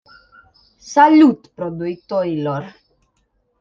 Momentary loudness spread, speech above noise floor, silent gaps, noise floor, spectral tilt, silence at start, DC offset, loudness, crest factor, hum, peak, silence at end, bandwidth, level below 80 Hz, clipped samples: 18 LU; 50 dB; none; -66 dBFS; -6.5 dB/octave; 0.85 s; under 0.1%; -16 LUFS; 16 dB; none; -2 dBFS; 0.9 s; 7.2 kHz; -60 dBFS; under 0.1%